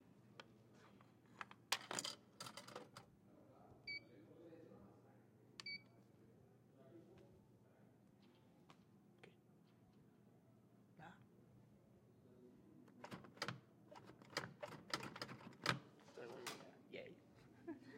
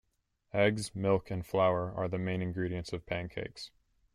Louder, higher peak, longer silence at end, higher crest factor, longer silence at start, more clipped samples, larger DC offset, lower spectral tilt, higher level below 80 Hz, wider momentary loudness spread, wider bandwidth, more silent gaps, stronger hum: second, -52 LUFS vs -33 LUFS; second, -20 dBFS vs -14 dBFS; second, 0 s vs 0.45 s; first, 36 dB vs 20 dB; second, 0 s vs 0.55 s; neither; neither; second, -3 dB/octave vs -6 dB/octave; second, -88 dBFS vs -58 dBFS; first, 23 LU vs 12 LU; first, 16 kHz vs 14.5 kHz; neither; neither